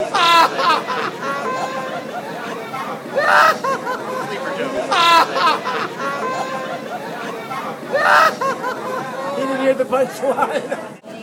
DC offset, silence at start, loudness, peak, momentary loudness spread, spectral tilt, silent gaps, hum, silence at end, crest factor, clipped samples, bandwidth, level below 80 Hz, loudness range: under 0.1%; 0 s; -18 LUFS; -2 dBFS; 15 LU; -3 dB/octave; none; none; 0 s; 16 dB; under 0.1%; 19 kHz; -66 dBFS; 3 LU